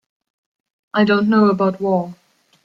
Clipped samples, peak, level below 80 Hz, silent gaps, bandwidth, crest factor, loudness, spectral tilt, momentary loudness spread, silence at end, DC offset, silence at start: under 0.1%; -4 dBFS; -62 dBFS; none; 5.8 kHz; 16 dB; -17 LUFS; -8.5 dB/octave; 9 LU; 0.5 s; under 0.1%; 0.95 s